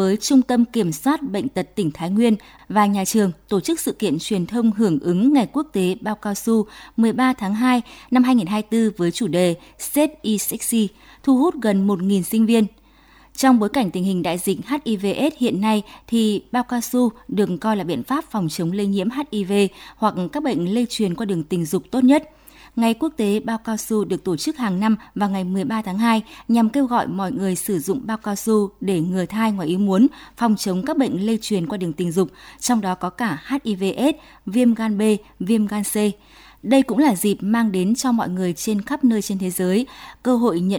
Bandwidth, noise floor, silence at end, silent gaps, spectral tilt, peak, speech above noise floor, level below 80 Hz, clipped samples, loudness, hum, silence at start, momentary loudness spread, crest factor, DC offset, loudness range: over 20 kHz; -51 dBFS; 0 s; none; -5.5 dB/octave; -4 dBFS; 31 dB; -54 dBFS; under 0.1%; -20 LUFS; none; 0 s; 7 LU; 16 dB; under 0.1%; 2 LU